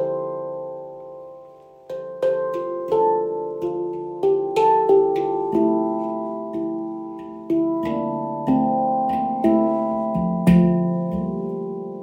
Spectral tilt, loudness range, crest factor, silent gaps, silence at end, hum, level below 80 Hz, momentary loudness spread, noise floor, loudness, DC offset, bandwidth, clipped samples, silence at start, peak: -9.5 dB/octave; 5 LU; 18 dB; none; 0 s; none; -50 dBFS; 16 LU; -45 dBFS; -22 LUFS; under 0.1%; 10 kHz; under 0.1%; 0 s; -4 dBFS